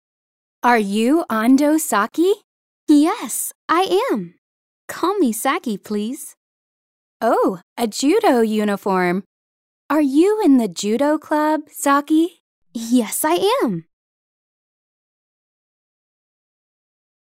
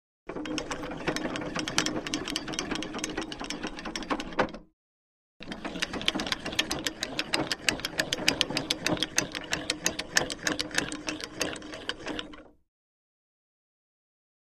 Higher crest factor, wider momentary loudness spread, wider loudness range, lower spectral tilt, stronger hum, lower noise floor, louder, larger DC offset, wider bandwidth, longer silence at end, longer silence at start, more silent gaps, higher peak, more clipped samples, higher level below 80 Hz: second, 18 dB vs 32 dB; about the same, 10 LU vs 10 LU; about the same, 5 LU vs 7 LU; first, -4.5 dB/octave vs -2 dB/octave; neither; about the same, under -90 dBFS vs under -90 dBFS; first, -18 LUFS vs -31 LUFS; neither; first, 16 kHz vs 14.5 kHz; first, 3.5 s vs 1.95 s; first, 0.65 s vs 0.25 s; first, 2.44-2.87 s, 3.55-3.68 s, 4.38-4.88 s, 6.37-7.20 s, 7.63-7.76 s, 9.26-9.89 s, 12.40-12.62 s vs 4.73-5.40 s; about the same, -2 dBFS vs -2 dBFS; neither; second, -68 dBFS vs -52 dBFS